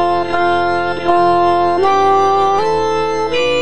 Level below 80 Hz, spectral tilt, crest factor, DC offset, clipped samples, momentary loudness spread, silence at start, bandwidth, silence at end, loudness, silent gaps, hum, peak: -44 dBFS; -5 dB/octave; 12 dB; 4%; under 0.1%; 5 LU; 0 s; 10 kHz; 0 s; -14 LUFS; none; none; 0 dBFS